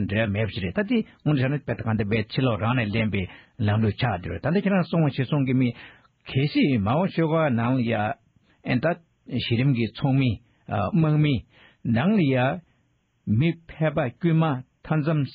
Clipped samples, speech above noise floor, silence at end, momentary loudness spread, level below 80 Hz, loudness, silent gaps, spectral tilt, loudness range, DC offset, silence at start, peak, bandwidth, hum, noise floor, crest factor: under 0.1%; 44 dB; 0 s; 8 LU; -52 dBFS; -24 LUFS; none; -6.5 dB/octave; 2 LU; under 0.1%; 0 s; -10 dBFS; 5.2 kHz; none; -67 dBFS; 14 dB